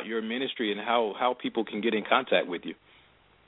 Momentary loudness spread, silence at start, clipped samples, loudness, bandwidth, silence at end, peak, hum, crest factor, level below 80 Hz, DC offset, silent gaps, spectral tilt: 11 LU; 0 s; under 0.1%; -28 LUFS; 4.1 kHz; 0.75 s; -8 dBFS; none; 22 dB; -74 dBFS; under 0.1%; none; -7.5 dB/octave